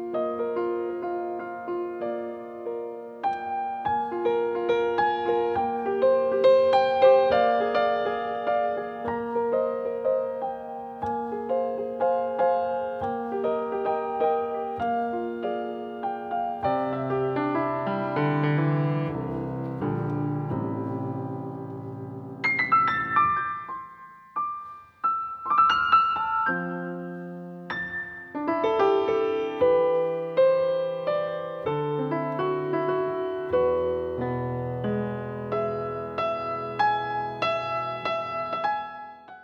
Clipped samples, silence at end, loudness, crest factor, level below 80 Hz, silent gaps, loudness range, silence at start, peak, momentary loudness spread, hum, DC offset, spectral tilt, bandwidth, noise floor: under 0.1%; 0 s; -26 LUFS; 20 dB; -60 dBFS; none; 7 LU; 0 s; -6 dBFS; 12 LU; none; under 0.1%; -8 dB/octave; 6.6 kHz; -47 dBFS